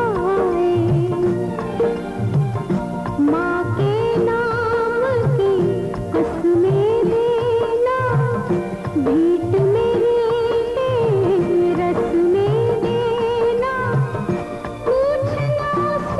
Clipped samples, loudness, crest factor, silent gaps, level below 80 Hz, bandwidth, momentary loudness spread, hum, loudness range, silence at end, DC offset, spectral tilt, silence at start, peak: under 0.1%; -19 LUFS; 10 dB; none; -42 dBFS; 12 kHz; 5 LU; none; 2 LU; 0 s; under 0.1%; -8.5 dB/octave; 0 s; -8 dBFS